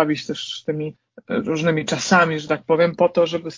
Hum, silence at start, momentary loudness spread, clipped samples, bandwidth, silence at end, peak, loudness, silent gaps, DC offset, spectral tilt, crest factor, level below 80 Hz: none; 0 s; 10 LU; under 0.1%; 7.6 kHz; 0 s; -2 dBFS; -20 LUFS; none; under 0.1%; -5 dB/octave; 18 dB; -60 dBFS